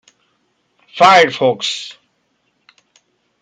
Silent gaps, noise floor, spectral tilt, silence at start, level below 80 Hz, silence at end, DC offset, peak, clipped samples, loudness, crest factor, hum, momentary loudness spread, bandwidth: none; -65 dBFS; -3 dB/octave; 0.95 s; -66 dBFS; 1.5 s; under 0.1%; 0 dBFS; under 0.1%; -12 LUFS; 18 dB; 60 Hz at -55 dBFS; 23 LU; 9.4 kHz